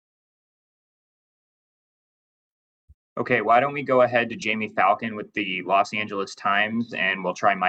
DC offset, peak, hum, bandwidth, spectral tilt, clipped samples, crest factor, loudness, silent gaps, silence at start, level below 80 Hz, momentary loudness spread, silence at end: under 0.1%; -6 dBFS; none; 8.4 kHz; -5 dB/octave; under 0.1%; 20 dB; -23 LUFS; none; 3.15 s; -70 dBFS; 9 LU; 0 s